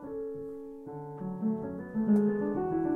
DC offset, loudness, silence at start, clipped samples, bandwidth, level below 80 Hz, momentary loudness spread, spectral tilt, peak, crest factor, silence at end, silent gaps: under 0.1%; -32 LUFS; 0 s; under 0.1%; 2.8 kHz; -62 dBFS; 16 LU; -11 dB/octave; -16 dBFS; 14 dB; 0 s; none